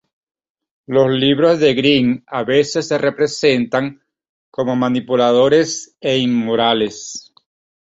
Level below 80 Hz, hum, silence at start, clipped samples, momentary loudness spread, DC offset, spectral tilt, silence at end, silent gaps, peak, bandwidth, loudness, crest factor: -56 dBFS; none; 0.9 s; under 0.1%; 10 LU; under 0.1%; -4.5 dB/octave; 0.65 s; 4.29-4.52 s; -2 dBFS; 8 kHz; -16 LUFS; 16 dB